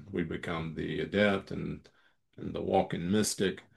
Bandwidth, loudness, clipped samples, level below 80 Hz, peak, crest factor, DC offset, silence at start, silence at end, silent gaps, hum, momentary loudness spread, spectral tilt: 12.5 kHz; -32 LUFS; under 0.1%; -62 dBFS; -14 dBFS; 20 dB; under 0.1%; 0 s; 0.15 s; none; none; 12 LU; -5 dB/octave